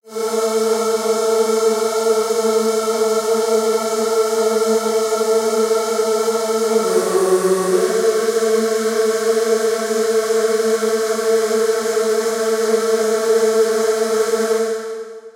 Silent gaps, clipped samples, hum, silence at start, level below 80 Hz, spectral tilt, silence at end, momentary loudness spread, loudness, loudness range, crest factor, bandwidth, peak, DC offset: none; under 0.1%; none; 0.05 s; -78 dBFS; -3 dB/octave; 0.05 s; 2 LU; -17 LUFS; 1 LU; 14 dB; 16.5 kHz; -4 dBFS; under 0.1%